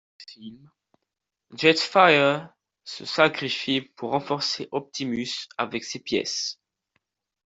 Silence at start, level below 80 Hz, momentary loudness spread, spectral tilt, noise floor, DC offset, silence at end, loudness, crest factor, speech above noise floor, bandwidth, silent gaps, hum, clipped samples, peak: 0.2 s; -68 dBFS; 23 LU; -3.5 dB/octave; -84 dBFS; under 0.1%; 0.9 s; -23 LUFS; 22 dB; 59 dB; 8.2 kHz; none; none; under 0.1%; -4 dBFS